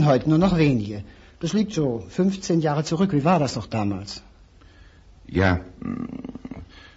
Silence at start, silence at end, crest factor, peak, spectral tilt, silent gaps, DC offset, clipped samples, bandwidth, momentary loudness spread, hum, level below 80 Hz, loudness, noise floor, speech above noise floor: 0 s; 0.15 s; 18 dB; -6 dBFS; -6.5 dB/octave; none; under 0.1%; under 0.1%; 8 kHz; 18 LU; none; -46 dBFS; -23 LUFS; -50 dBFS; 28 dB